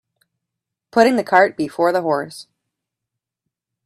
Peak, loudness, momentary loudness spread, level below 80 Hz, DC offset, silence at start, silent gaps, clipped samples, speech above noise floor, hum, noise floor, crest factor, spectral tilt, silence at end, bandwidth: 0 dBFS; -17 LUFS; 12 LU; -66 dBFS; under 0.1%; 0.95 s; none; under 0.1%; 67 dB; none; -83 dBFS; 20 dB; -5 dB/octave; 1.45 s; 14.5 kHz